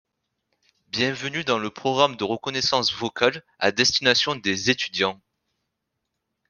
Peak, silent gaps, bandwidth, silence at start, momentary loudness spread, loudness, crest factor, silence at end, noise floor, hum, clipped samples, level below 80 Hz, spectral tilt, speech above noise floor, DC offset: -2 dBFS; none; 11 kHz; 0.95 s; 7 LU; -22 LUFS; 24 dB; 1.35 s; -80 dBFS; none; under 0.1%; -64 dBFS; -3 dB/octave; 56 dB; under 0.1%